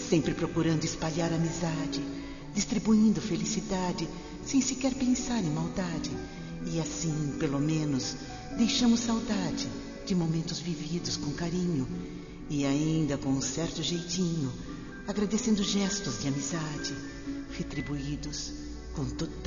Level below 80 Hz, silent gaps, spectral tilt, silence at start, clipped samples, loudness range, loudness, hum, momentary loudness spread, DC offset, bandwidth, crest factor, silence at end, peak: -48 dBFS; none; -5 dB/octave; 0 s; under 0.1%; 3 LU; -31 LUFS; none; 11 LU; under 0.1%; 7.4 kHz; 18 dB; 0 s; -12 dBFS